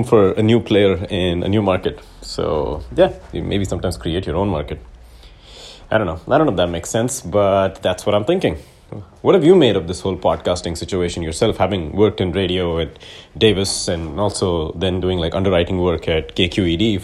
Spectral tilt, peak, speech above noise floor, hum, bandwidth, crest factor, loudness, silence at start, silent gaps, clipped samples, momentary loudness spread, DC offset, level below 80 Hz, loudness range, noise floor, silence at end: -5.5 dB/octave; 0 dBFS; 24 dB; none; 13.5 kHz; 18 dB; -18 LUFS; 0 s; none; under 0.1%; 10 LU; under 0.1%; -36 dBFS; 5 LU; -42 dBFS; 0 s